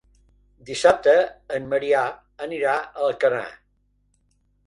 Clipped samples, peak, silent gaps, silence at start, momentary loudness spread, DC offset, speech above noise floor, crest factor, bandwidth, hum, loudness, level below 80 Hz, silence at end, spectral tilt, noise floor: under 0.1%; -2 dBFS; none; 0.65 s; 15 LU; under 0.1%; 45 dB; 20 dB; 11 kHz; none; -22 LUFS; -60 dBFS; 1.15 s; -3.5 dB/octave; -66 dBFS